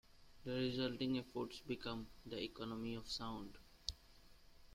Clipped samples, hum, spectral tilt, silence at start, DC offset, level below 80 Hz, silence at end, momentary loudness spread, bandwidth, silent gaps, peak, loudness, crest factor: under 0.1%; none; -5 dB/octave; 0.1 s; under 0.1%; -64 dBFS; 0 s; 10 LU; 16 kHz; none; -20 dBFS; -45 LUFS; 26 dB